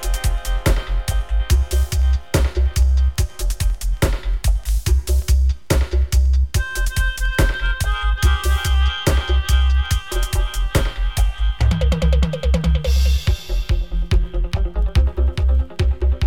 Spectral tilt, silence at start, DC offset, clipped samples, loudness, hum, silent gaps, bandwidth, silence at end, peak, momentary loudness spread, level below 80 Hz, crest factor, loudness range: -5 dB/octave; 0 s; 2%; under 0.1%; -20 LUFS; none; none; 17 kHz; 0 s; -2 dBFS; 5 LU; -18 dBFS; 14 dB; 1 LU